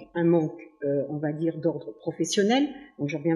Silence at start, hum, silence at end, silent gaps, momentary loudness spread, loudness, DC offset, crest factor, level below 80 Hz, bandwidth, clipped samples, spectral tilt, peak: 0 s; none; 0 s; none; 11 LU; -27 LUFS; under 0.1%; 16 dB; -72 dBFS; 11.5 kHz; under 0.1%; -5.5 dB/octave; -10 dBFS